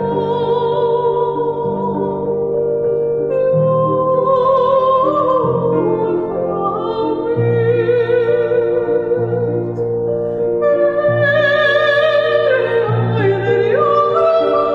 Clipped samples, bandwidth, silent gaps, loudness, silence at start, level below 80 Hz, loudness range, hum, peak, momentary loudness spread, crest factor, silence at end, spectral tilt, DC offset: under 0.1%; 5.8 kHz; none; -15 LUFS; 0 s; -48 dBFS; 3 LU; none; -4 dBFS; 6 LU; 12 dB; 0 s; -8.5 dB/octave; under 0.1%